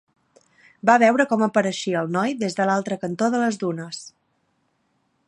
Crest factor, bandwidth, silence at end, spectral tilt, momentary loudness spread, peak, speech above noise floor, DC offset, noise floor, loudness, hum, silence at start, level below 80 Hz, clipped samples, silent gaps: 22 dB; 11.5 kHz; 1.2 s; -5 dB/octave; 12 LU; 0 dBFS; 48 dB; under 0.1%; -69 dBFS; -21 LUFS; none; 0.85 s; -72 dBFS; under 0.1%; none